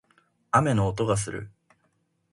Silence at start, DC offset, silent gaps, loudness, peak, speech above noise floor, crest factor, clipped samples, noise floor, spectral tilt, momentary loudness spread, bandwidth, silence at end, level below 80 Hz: 0.55 s; under 0.1%; none; -25 LUFS; -6 dBFS; 47 dB; 22 dB; under 0.1%; -71 dBFS; -6 dB/octave; 16 LU; 11.5 kHz; 0.85 s; -52 dBFS